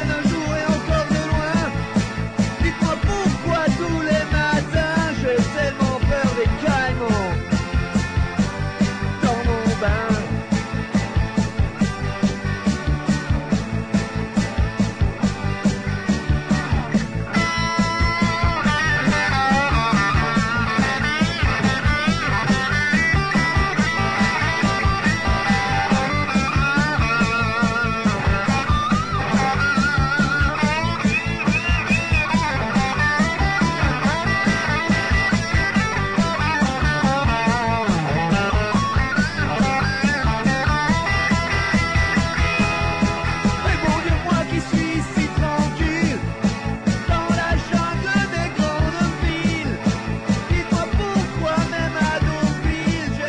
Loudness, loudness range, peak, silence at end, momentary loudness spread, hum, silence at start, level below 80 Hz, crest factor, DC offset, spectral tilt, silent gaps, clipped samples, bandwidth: -20 LUFS; 3 LU; -8 dBFS; 0 s; 4 LU; none; 0 s; -30 dBFS; 12 dB; under 0.1%; -5.5 dB/octave; none; under 0.1%; 10.5 kHz